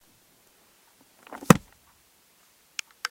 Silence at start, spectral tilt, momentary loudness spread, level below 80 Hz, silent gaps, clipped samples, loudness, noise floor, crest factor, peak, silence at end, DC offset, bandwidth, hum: 1.5 s; -5 dB/octave; 23 LU; -56 dBFS; none; under 0.1%; -24 LUFS; -61 dBFS; 30 dB; 0 dBFS; 1.55 s; under 0.1%; 17 kHz; none